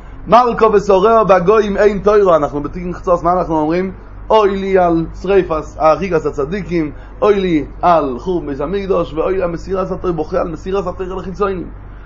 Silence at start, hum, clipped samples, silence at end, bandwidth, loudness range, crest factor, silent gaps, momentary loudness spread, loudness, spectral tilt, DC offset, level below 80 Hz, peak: 0 s; none; under 0.1%; 0 s; 7.4 kHz; 6 LU; 14 dB; none; 10 LU; -14 LUFS; -7 dB/octave; under 0.1%; -32 dBFS; 0 dBFS